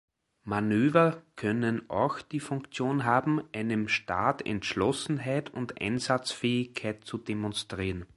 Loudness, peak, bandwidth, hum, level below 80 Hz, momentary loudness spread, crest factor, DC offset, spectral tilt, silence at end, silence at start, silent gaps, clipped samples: -30 LUFS; -8 dBFS; 11.5 kHz; none; -56 dBFS; 9 LU; 22 dB; under 0.1%; -5.5 dB/octave; 0.1 s; 0.45 s; none; under 0.1%